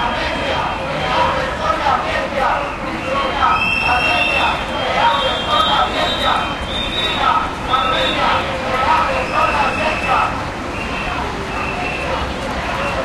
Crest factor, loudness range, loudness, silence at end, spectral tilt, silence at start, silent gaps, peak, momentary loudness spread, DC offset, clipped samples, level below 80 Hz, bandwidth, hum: 16 dB; 3 LU; -17 LUFS; 0 s; -4 dB/octave; 0 s; none; -2 dBFS; 7 LU; under 0.1%; under 0.1%; -32 dBFS; 15 kHz; none